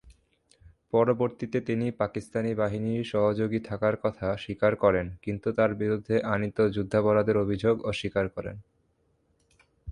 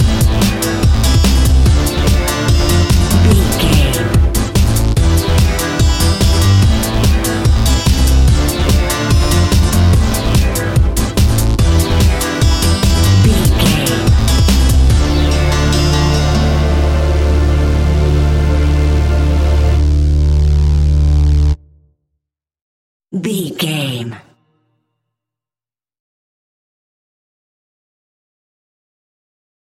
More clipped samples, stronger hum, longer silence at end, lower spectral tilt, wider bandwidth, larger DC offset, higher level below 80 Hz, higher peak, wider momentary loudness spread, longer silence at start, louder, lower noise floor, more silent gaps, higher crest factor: neither; neither; second, 0 s vs 5.6 s; first, -7.5 dB/octave vs -5.5 dB/octave; second, 11 kHz vs 16.5 kHz; neither; second, -54 dBFS vs -14 dBFS; second, -8 dBFS vs 0 dBFS; first, 8 LU vs 3 LU; about the same, 0.05 s vs 0 s; second, -27 LUFS vs -12 LUFS; second, -70 dBFS vs under -90 dBFS; second, none vs 22.61-23.00 s; first, 20 dB vs 12 dB